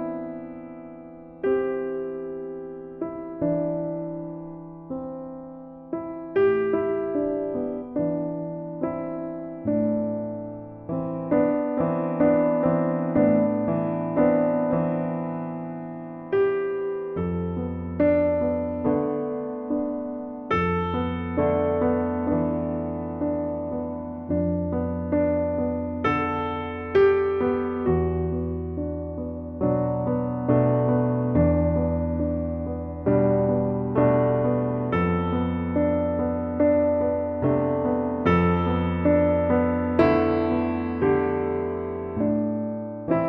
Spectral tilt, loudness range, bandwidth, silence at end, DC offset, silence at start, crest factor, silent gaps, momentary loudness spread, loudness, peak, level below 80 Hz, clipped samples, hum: -10.5 dB/octave; 6 LU; 5.4 kHz; 0 s; under 0.1%; 0 s; 18 dB; none; 13 LU; -25 LUFS; -6 dBFS; -44 dBFS; under 0.1%; none